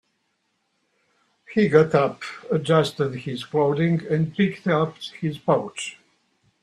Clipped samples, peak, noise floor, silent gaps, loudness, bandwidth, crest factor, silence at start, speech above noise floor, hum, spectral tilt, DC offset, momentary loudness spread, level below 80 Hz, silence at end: under 0.1%; -2 dBFS; -72 dBFS; none; -22 LUFS; 12 kHz; 22 dB; 1.5 s; 50 dB; none; -6.5 dB/octave; under 0.1%; 12 LU; -62 dBFS; 0.7 s